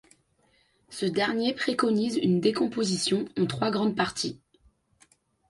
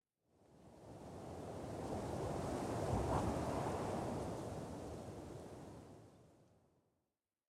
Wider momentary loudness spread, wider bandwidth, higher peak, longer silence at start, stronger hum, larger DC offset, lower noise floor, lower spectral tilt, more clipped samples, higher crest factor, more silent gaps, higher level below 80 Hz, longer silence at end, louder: second, 8 LU vs 19 LU; second, 11.5 kHz vs 16 kHz; first, -10 dBFS vs -26 dBFS; first, 0.9 s vs 0.5 s; neither; neither; second, -67 dBFS vs under -90 dBFS; second, -5 dB/octave vs -6.5 dB/octave; neither; about the same, 18 dB vs 18 dB; neither; second, -64 dBFS vs -58 dBFS; about the same, 1.15 s vs 1.15 s; first, -27 LUFS vs -44 LUFS